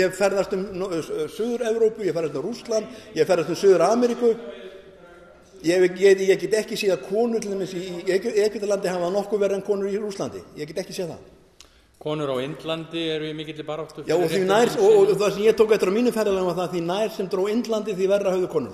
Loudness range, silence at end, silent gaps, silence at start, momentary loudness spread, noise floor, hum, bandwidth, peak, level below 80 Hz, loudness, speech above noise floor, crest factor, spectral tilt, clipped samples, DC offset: 9 LU; 0 s; none; 0 s; 14 LU; -53 dBFS; none; 13.5 kHz; -6 dBFS; -60 dBFS; -23 LUFS; 31 dB; 16 dB; -5 dB/octave; under 0.1%; under 0.1%